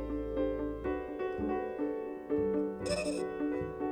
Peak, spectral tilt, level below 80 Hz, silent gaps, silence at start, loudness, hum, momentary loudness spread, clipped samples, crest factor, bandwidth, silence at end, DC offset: -22 dBFS; -6 dB/octave; -50 dBFS; none; 0 s; -35 LUFS; none; 4 LU; under 0.1%; 14 dB; 11.5 kHz; 0 s; under 0.1%